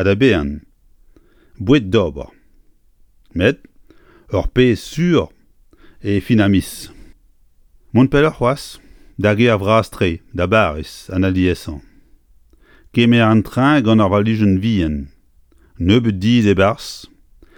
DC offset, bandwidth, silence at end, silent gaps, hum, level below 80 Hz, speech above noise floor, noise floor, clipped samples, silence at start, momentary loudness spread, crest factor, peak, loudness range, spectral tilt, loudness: under 0.1%; 18.5 kHz; 0.5 s; none; none; -36 dBFS; 36 dB; -51 dBFS; under 0.1%; 0 s; 18 LU; 16 dB; 0 dBFS; 5 LU; -7 dB/octave; -16 LUFS